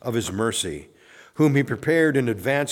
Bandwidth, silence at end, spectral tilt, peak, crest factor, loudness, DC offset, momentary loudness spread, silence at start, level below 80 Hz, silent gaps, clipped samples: 17.5 kHz; 0 s; -5 dB/octave; -8 dBFS; 16 dB; -22 LUFS; under 0.1%; 10 LU; 0.05 s; -56 dBFS; none; under 0.1%